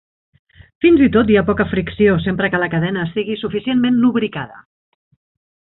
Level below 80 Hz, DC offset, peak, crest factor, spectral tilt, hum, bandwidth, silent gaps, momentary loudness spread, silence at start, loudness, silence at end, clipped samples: -42 dBFS; under 0.1%; -2 dBFS; 16 dB; -12 dB/octave; none; 4.1 kHz; none; 10 LU; 0.8 s; -16 LUFS; 1 s; under 0.1%